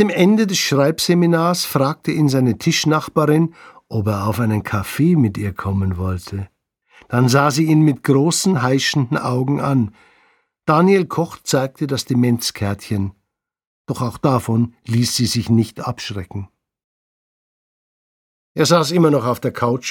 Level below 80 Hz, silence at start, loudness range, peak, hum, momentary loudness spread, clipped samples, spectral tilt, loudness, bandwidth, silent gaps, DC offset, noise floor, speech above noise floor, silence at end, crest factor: -52 dBFS; 0 s; 5 LU; -2 dBFS; none; 11 LU; under 0.1%; -5.5 dB/octave; -17 LUFS; 19 kHz; 13.67-13.85 s, 16.84-18.55 s; under 0.1%; -59 dBFS; 42 dB; 0 s; 16 dB